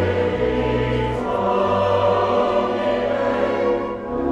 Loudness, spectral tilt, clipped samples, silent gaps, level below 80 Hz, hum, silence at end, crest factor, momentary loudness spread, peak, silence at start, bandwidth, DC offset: -20 LUFS; -7.5 dB/octave; under 0.1%; none; -38 dBFS; none; 0 s; 12 dB; 4 LU; -6 dBFS; 0 s; 9 kHz; under 0.1%